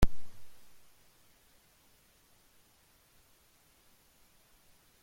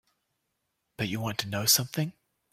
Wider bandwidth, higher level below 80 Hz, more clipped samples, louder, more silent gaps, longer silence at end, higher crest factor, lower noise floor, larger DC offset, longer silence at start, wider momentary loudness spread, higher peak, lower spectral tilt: about the same, 16.5 kHz vs 16.5 kHz; first, -44 dBFS vs -66 dBFS; neither; second, -44 LUFS vs -27 LUFS; neither; first, 4.45 s vs 0.4 s; about the same, 24 dB vs 22 dB; second, -66 dBFS vs -80 dBFS; neither; second, 0 s vs 1 s; second, 4 LU vs 12 LU; about the same, -10 dBFS vs -10 dBFS; first, -6 dB/octave vs -2.5 dB/octave